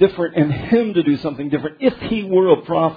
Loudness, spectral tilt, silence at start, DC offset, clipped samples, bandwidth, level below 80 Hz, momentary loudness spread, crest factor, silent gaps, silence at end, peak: -18 LUFS; -10 dB/octave; 0 s; under 0.1%; under 0.1%; 5 kHz; -48 dBFS; 7 LU; 16 dB; none; 0 s; 0 dBFS